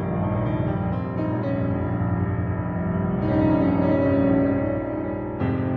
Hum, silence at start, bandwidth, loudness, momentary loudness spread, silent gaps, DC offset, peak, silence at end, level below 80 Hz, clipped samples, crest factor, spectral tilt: none; 0 s; 4.9 kHz; -23 LUFS; 6 LU; none; under 0.1%; -8 dBFS; 0 s; -40 dBFS; under 0.1%; 14 dB; -11.5 dB/octave